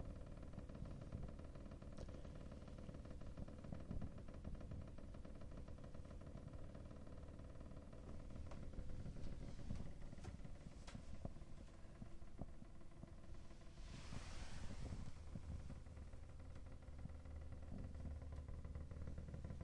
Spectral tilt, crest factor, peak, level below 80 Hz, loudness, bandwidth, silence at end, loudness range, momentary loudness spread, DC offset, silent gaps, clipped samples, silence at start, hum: -7 dB/octave; 18 dB; -34 dBFS; -56 dBFS; -57 LUFS; 11 kHz; 0 s; 3 LU; 6 LU; under 0.1%; none; under 0.1%; 0 s; none